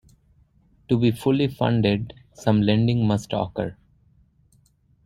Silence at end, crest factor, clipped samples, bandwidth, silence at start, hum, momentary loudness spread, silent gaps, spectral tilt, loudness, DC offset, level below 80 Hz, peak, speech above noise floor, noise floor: 1.3 s; 20 dB; under 0.1%; 14 kHz; 0.9 s; none; 9 LU; none; -7.5 dB/octave; -22 LUFS; under 0.1%; -52 dBFS; -4 dBFS; 39 dB; -61 dBFS